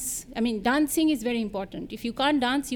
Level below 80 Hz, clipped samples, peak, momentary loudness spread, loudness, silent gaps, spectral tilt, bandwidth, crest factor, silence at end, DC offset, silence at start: -52 dBFS; under 0.1%; -10 dBFS; 11 LU; -26 LUFS; none; -3 dB/octave; 19.5 kHz; 16 dB; 0 s; under 0.1%; 0 s